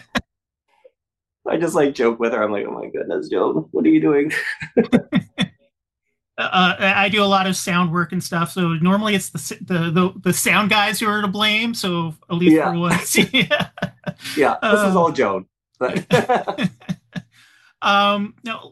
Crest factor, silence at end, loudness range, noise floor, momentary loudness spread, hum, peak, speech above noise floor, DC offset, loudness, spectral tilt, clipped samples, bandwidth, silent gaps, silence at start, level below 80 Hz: 18 dB; 0.05 s; 4 LU; -84 dBFS; 12 LU; none; 0 dBFS; 66 dB; under 0.1%; -18 LUFS; -4.5 dB/octave; under 0.1%; 12.5 kHz; none; 0.15 s; -54 dBFS